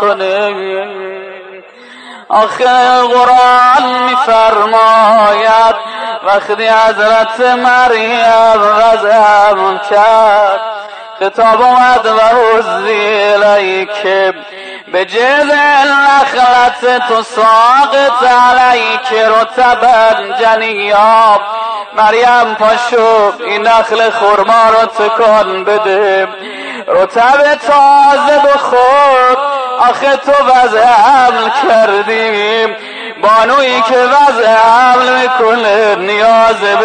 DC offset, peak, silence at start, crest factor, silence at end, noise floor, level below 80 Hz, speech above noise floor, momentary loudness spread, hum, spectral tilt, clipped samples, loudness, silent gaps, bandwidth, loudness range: under 0.1%; 0 dBFS; 0 s; 8 dB; 0 s; -33 dBFS; -48 dBFS; 26 dB; 8 LU; none; -2.5 dB/octave; under 0.1%; -8 LUFS; none; 9.6 kHz; 2 LU